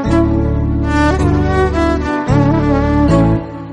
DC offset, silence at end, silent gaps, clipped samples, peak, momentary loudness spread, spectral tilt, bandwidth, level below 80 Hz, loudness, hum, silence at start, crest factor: under 0.1%; 0 s; none; under 0.1%; 0 dBFS; 4 LU; -8 dB/octave; 10 kHz; -20 dBFS; -14 LUFS; none; 0 s; 12 dB